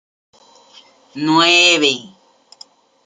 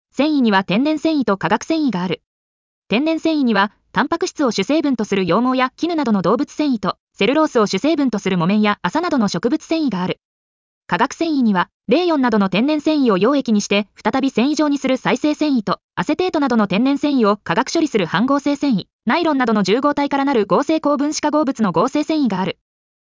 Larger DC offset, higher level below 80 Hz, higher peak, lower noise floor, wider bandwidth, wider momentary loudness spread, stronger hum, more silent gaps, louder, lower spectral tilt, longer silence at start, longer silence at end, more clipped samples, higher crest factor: neither; second, -70 dBFS vs -58 dBFS; first, 0 dBFS vs -4 dBFS; second, -47 dBFS vs under -90 dBFS; first, 9.6 kHz vs 7.6 kHz; first, 16 LU vs 4 LU; neither; second, none vs 2.26-2.82 s, 7.00-7.07 s, 10.25-10.81 s, 11.74-11.80 s, 15.84-15.89 s, 18.93-18.99 s; first, -12 LUFS vs -18 LUFS; second, -2 dB/octave vs -5.5 dB/octave; first, 1.15 s vs 0.15 s; first, 1 s vs 0.6 s; neither; about the same, 18 dB vs 14 dB